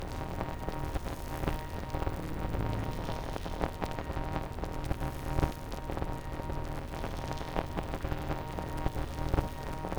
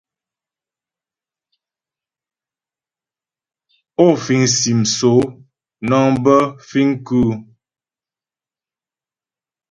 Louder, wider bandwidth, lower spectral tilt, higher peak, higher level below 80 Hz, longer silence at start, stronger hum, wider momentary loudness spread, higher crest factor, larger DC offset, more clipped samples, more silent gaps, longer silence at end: second, -37 LUFS vs -15 LUFS; first, over 20 kHz vs 10.5 kHz; first, -6.5 dB/octave vs -5 dB/octave; second, -12 dBFS vs 0 dBFS; first, -38 dBFS vs -50 dBFS; second, 0 s vs 4 s; neither; second, 5 LU vs 10 LU; about the same, 22 dB vs 20 dB; neither; neither; neither; second, 0 s vs 2.3 s